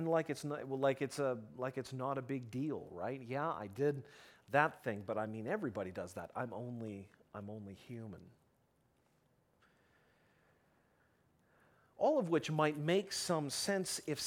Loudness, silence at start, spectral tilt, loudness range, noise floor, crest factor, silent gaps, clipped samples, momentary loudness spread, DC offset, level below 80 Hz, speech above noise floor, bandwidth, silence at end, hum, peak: -38 LUFS; 0 s; -5 dB/octave; 16 LU; -75 dBFS; 24 dB; none; under 0.1%; 16 LU; under 0.1%; -78 dBFS; 37 dB; 18.5 kHz; 0 s; none; -14 dBFS